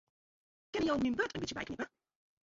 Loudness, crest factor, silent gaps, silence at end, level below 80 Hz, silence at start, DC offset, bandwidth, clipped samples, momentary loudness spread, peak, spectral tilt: -36 LUFS; 18 dB; none; 0.65 s; -62 dBFS; 0.75 s; under 0.1%; 7.6 kHz; under 0.1%; 10 LU; -20 dBFS; -3.5 dB/octave